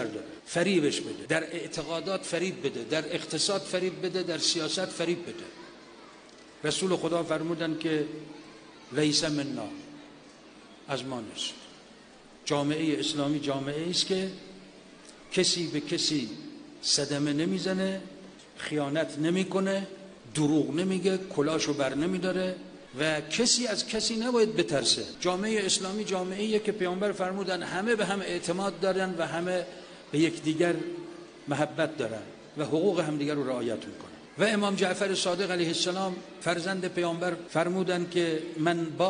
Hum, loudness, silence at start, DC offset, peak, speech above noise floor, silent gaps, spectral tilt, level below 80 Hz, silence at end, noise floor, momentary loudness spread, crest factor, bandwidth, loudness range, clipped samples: none; -29 LUFS; 0 s; under 0.1%; -10 dBFS; 24 dB; none; -4 dB/octave; -66 dBFS; 0 s; -53 dBFS; 16 LU; 20 dB; 10 kHz; 5 LU; under 0.1%